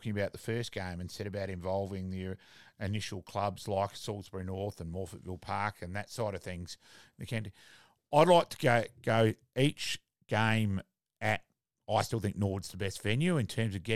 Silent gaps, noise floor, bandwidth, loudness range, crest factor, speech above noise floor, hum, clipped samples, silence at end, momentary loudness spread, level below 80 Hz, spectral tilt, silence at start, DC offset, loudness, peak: none; -63 dBFS; 14.5 kHz; 10 LU; 22 dB; 31 dB; none; under 0.1%; 0 s; 13 LU; -62 dBFS; -5.5 dB/octave; 0 s; 0.1%; -33 LUFS; -10 dBFS